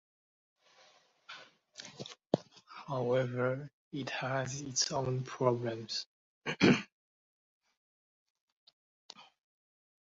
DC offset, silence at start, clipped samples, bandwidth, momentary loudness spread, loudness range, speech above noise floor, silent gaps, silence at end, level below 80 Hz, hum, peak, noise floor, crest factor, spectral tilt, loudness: under 0.1%; 1.3 s; under 0.1%; 7.6 kHz; 23 LU; 5 LU; 33 dB; 3.73-3.91 s, 6.06-6.41 s, 6.92-7.61 s, 7.77-8.35 s, 8.41-8.67 s, 8.73-9.09 s; 0.85 s; -72 dBFS; none; -10 dBFS; -66 dBFS; 28 dB; -4.5 dB/octave; -34 LUFS